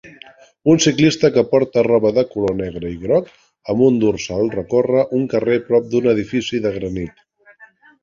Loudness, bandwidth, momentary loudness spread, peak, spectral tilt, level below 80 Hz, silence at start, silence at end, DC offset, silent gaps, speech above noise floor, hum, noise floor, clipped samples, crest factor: -17 LUFS; 7.6 kHz; 10 LU; 0 dBFS; -5.5 dB/octave; -48 dBFS; 0.05 s; 0.35 s; under 0.1%; none; 32 dB; none; -48 dBFS; under 0.1%; 16 dB